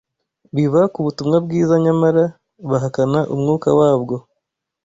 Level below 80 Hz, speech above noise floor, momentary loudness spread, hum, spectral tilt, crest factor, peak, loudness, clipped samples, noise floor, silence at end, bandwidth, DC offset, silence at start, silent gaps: -56 dBFS; 61 dB; 8 LU; none; -8 dB/octave; 14 dB; -2 dBFS; -17 LUFS; under 0.1%; -77 dBFS; 0.65 s; 7.8 kHz; under 0.1%; 0.55 s; none